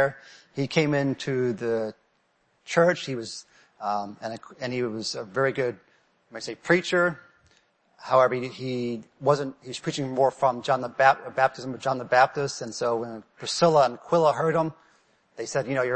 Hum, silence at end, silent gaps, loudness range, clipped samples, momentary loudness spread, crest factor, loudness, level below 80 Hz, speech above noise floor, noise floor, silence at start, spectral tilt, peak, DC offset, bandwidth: none; 0 s; none; 5 LU; under 0.1%; 14 LU; 20 dB; -25 LUFS; -68 dBFS; 43 dB; -69 dBFS; 0 s; -5 dB/octave; -6 dBFS; under 0.1%; 8.8 kHz